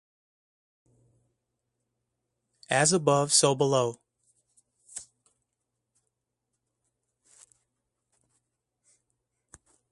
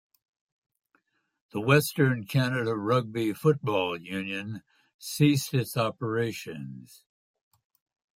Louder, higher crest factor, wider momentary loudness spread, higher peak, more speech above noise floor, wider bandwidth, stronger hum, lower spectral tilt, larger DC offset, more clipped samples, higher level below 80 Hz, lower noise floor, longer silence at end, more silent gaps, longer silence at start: first, -24 LUFS vs -27 LUFS; first, 26 dB vs 20 dB; first, 22 LU vs 16 LU; about the same, -8 dBFS vs -8 dBFS; first, 59 dB vs 45 dB; second, 11.5 kHz vs 16.5 kHz; neither; second, -3 dB/octave vs -6 dB/octave; neither; neither; second, -74 dBFS vs -68 dBFS; first, -83 dBFS vs -72 dBFS; first, 4.9 s vs 1.35 s; second, none vs 4.94-4.99 s; first, 2.7 s vs 1.55 s